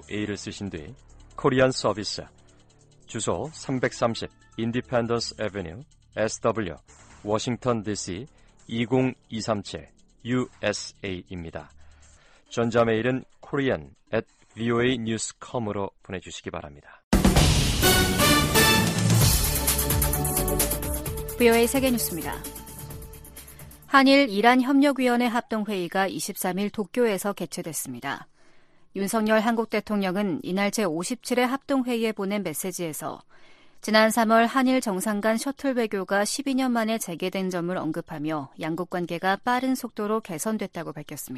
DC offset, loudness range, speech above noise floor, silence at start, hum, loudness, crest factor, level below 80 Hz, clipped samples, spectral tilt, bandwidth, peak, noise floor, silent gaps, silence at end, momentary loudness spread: under 0.1%; 8 LU; 30 dB; 0.1 s; none; -25 LUFS; 22 dB; -40 dBFS; under 0.1%; -4.5 dB/octave; 15.5 kHz; -4 dBFS; -56 dBFS; 17.04-17.11 s; 0 s; 17 LU